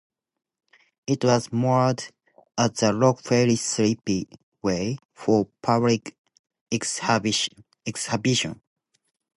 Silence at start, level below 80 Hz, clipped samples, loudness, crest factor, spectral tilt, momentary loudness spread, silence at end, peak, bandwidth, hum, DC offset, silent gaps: 1.1 s; -58 dBFS; under 0.1%; -24 LUFS; 20 dB; -4.5 dB/octave; 12 LU; 0.85 s; -6 dBFS; 11.5 kHz; none; under 0.1%; 4.43-4.52 s, 5.05-5.09 s, 6.18-6.24 s, 6.39-6.44 s, 6.61-6.66 s